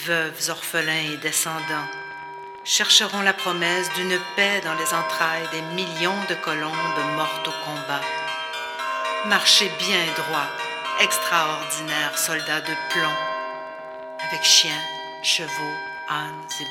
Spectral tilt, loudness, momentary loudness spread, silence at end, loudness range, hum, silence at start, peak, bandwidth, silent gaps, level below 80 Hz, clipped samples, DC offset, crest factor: -1 dB/octave; -22 LUFS; 14 LU; 0 s; 4 LU; none; 0 s; -2 dBFS; 19 kHz; none; -74 dBFS; under 0.1%; under 0.1%; 22 dB